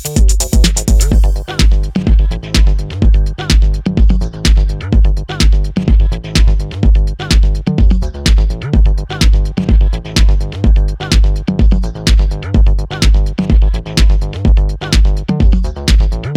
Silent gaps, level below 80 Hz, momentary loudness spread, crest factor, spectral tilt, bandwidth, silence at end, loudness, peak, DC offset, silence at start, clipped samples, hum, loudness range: none; -10 dBFS; 2 LU; 10 dB; -5 dB/octave; 14 kHz; 0 s; -13 LUFS; 0 dBFS; under 0.1%; 0 s; under 0.1%; none; 0 LU